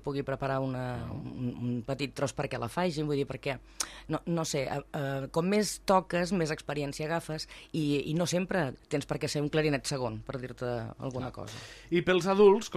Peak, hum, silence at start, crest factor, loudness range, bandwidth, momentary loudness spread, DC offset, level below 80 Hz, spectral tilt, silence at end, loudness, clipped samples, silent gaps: -12 dBFS; none; 0 s; 20 dB; 3 LU; 15 kHz; 10 LU; under 0.1%; -56 dBFS; -5.5 dB/octave; 0 s; -31 LUFS; under 0.1%; none